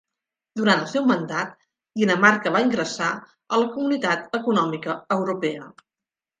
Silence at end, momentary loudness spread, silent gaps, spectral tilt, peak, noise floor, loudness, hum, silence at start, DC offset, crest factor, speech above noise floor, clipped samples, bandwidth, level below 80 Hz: 0.7 s; 12 LU; none; -5 dB/octave; -2 dBFS; -90 dBFS; -22 LUFS; none; 0.55 s; under 0.1%; 22 dB; 67 dB; under 0.1%; 9.6 kHz; -70 dBFS